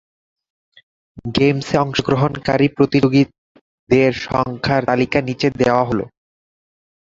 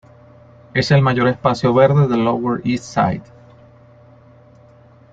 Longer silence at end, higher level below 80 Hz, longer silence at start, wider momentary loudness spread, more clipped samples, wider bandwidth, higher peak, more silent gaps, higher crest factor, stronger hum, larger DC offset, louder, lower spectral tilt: second, 0.95 s vs 1.9 s; about the same, -46 dBFS vs -50 dBFS; first, 1.15 s vs 0.75 s; about the same, 6 LU vs 8 LU; neither; about the same, 7.8 kHz vs 7.8 kHz; about the same, -2 dBFS vs -2 dBFS; first, 3.38-3.55 s, 3.61-3.87 s vs none; about the same, 18 dB vs 16 dB; neither; neither; about the same, -17 LUFS vs -16 LUFS; about the same, -6.5 dB/octave vs -7 dB/octave